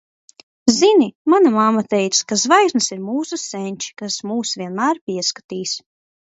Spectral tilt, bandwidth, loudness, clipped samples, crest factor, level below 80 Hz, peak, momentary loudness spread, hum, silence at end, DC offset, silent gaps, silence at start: -3 dB/octave; 8.2 kHz; -18 LUFS; under 0.1%; 18 dB; -64 dBFS; 0 dBFS; 12 LU; none; 0.5 s; under 0.1%; 1.15-1.25 s, 5.01-5.07 s, 5.44-5.49 s; 0.65 s